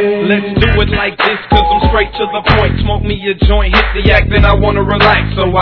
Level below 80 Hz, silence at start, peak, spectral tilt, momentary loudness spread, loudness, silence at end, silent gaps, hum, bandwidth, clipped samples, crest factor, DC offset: -16 dBFS; 0 s; 0 dBFS; -8 dB/octave; 5 LU; -11 LUFS; 0 s; none; none; 5.4 kHz; 0.5%; 10 dB; 0.2%